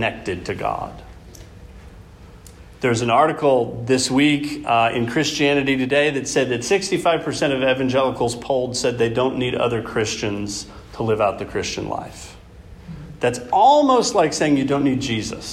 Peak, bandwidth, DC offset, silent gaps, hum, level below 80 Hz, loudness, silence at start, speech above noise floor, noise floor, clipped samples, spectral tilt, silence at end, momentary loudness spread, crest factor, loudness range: -4 dBFS; 13.5 kHz; under 0.1%; none; none; -46 dBFS; -20 LUFS; 0 s; 23 dB; -42 dBFS; under 0.1%; -4.5 dB/octave; 0 s; 11 LU; 16 dB; 6 LU